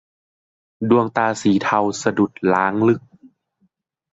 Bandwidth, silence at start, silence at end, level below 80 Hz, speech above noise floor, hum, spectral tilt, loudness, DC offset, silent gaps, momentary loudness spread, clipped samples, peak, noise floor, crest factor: 8 kHz; 0.8 s; 1.15 s; -58 dBFS; 48 dB; none; -6 dB/octave; -19 LUFS; under 0.1%; none; 4 LU; under 0.1%; -4 dBFS; -66 dBFS; 18 dB